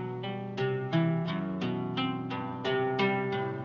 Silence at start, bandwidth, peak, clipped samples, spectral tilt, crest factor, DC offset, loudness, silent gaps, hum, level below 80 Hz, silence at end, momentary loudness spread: 0 s; 6.8 kHz; -16 dBFS; under 0.1%; -8 dB/octave; 16 dB; under 0.1%; -31 LUFS; none; none; -70 dBFS; 0 s; 7 LU